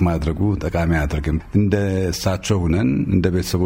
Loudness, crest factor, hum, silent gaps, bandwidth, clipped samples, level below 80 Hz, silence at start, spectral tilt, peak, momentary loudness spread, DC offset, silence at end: -20 LUFS; 16 dB; none; none; 16.5 kHz; under 0.1%; -30 dBFS; 0 s; -6.5 dB/octave; -2 dBFS; 3 LU; under 0.1%; 0 s